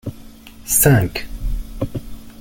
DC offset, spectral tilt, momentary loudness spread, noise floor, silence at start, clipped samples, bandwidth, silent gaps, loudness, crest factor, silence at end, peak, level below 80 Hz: under 0.1%; -4.5 dB/octave; 20 LU; -39 dBFS; 0.05 s; under 0.1%; 17 kHz; none; -17 LUFS; 18 dB; 0 s; -2 dBFS; -30 dBFS